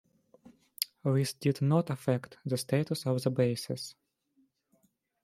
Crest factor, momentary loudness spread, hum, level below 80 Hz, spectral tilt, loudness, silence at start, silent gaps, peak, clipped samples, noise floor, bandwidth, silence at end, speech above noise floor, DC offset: 24 dB; 8 LU; none; -72 dBFS; -6 dB/octave; -31 LUFS; 0.45 s; none; -8 dBFS; under 0.1%; -72 dBFS; 16.5 kHz; 1.3 s; 42 dB; under 0.1%